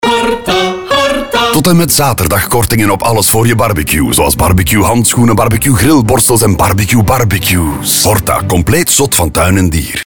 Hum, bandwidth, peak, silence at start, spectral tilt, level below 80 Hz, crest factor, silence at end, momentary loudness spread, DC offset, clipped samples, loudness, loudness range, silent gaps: none; over 20 kHz; 0 dBFS; 0 s; -4 dB/octave; -24 dBFS; 10 dB; 0.05 s; 4 LU; 2%; under 0.1%; -9 LUFS; 1 LU; none